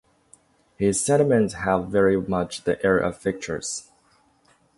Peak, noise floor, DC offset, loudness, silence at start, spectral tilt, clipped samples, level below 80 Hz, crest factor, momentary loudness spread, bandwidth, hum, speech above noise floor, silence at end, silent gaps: -6 dBFS; -61 dBFS; under 0.1%; -23 LUFS; 0.8 s; -5 dB/octave; under 0.1%; -50 dBFS; 18 dB; 10 LU; 11.5 kHz; none; 39 dB; 0.95 s; none